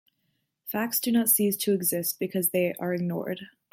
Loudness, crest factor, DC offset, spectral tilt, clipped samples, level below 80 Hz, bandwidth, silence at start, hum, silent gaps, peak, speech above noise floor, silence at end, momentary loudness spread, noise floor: -26 LUFS; 18 dB; under 0.1%; -4 dB/octave; under 0.1%; -72 dBFS; 16.5 kHz; 0.65 s; none; none; -8 dBFS; 49 dB; 0.25 s; 12 LU; -76 dBFS